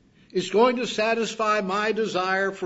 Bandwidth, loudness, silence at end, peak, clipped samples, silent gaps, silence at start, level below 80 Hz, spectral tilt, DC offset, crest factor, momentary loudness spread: 8 kHz; -24 LUFS; 0 s; -8 dBFS; under 0.1%; none; 0.35 s; -68 dBFS; -4 dB/octave; under 0.1%; 16 dB; 4 LU